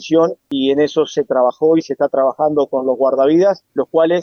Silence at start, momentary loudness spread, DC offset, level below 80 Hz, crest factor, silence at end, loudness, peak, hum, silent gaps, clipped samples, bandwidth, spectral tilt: 0 s; 5 LU; under 0.1%; -62 dBFS; 14 dB; 0 s; -15 LUFS; -2 dBFS; none; none; under 0.1%; 6.8 kHz; -6 dB/octave